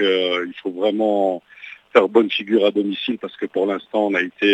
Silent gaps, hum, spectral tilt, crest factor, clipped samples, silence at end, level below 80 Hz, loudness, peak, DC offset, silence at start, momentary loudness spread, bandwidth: none; none; -6 dB/octave; 20 dB; under 0.1%; 0 s; -74 dBFS; -20 LUFS; 0 dBFS; under 0.1%; 0 s; 10 LU; 8.8 kHz